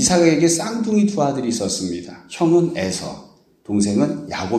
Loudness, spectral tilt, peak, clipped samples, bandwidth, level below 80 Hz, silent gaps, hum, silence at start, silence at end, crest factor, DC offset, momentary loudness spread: -19 LUFS; -4.5 dB/octave; -2 dBFS; under 0.1%; 13.5 kHz; -52 dBFS; none; none; 0 s; 0 s; 18 dB; under 0.1%; 13 LU